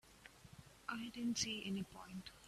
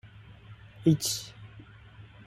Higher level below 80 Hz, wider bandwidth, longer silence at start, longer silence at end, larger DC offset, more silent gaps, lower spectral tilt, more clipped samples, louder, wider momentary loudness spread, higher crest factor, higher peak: second, -70 dBFS vs -60 dBFS; second, 14.5 kHz vs 16 kHz; about the same, 0.05 s vs 0.05 s; second, 0 s vs 0.25 s; neither; neither; second, -3 dB/octave vs -5 dB/octave; neither; second, -44 LUFS vs -28 LUFS; second, 21 LU vs 26 LU; about the same, 20 dB vs 22 dB; second, -28 dBFS vs -12 dBFS